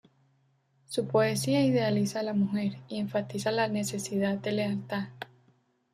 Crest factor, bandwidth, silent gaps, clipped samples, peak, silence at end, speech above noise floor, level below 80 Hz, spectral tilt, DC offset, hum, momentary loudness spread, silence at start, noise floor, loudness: 16 dB; 15 kHz; none; under 0.1%; -14 dBFS; 0.7 s; 41 dB; -70 dBFS; -5.5 dB/octave; under 0.1%; none; 10 LU; 0.9 s; -69 dBFS; -29 LUFS